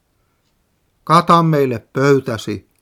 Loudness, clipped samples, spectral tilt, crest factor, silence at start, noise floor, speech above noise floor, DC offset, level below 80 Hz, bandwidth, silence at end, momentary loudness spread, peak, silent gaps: -15 LUFS; under 0.1%; -6.5 dB/octave; 16 dB; 1.05 s; -63 dBFS; 49 dB; under 0.1%; -58 dBFS; 15 kHz; 0.25 s; 14 LU; 0 dBFS; none